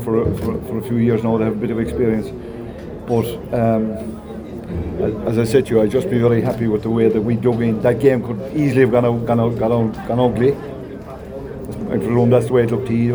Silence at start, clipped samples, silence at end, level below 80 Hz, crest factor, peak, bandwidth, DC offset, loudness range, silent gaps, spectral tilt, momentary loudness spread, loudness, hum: 0 s; under 0.1%; 0 s; -40 dBFS; 16 dB; -2 dBFS; over 20 kHz; under 0.1%; 5 LU; none; -8.5 dB/octave; 16 LU; -18 LUFS; none